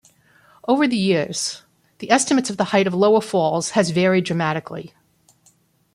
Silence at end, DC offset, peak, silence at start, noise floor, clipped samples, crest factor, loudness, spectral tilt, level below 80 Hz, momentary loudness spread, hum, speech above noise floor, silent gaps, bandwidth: 1.1 s; under 0.1%; -2 dBFS; 0.65 s; -59 dBFS; under 0.1%; 18 dB; -19 LUFS; -4.5 dB/octave; -64 dBFS; 14 LU; none; 40 dB; none; 12.5 kHz